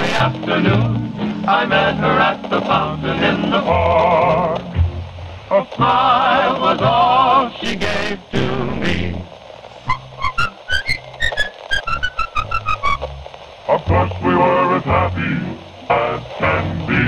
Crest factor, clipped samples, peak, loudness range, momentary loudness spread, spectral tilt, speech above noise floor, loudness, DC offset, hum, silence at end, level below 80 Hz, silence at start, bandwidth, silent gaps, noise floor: 16 dB; under 0.1%; -2 dBFS; 6 LU; 10 LU; -6 dB/octave; 22 dB; -17 LUFS; under 0.1%; none; 0 s; -36 dBFS; 0 s; 12 kHz; none; -37 dBFS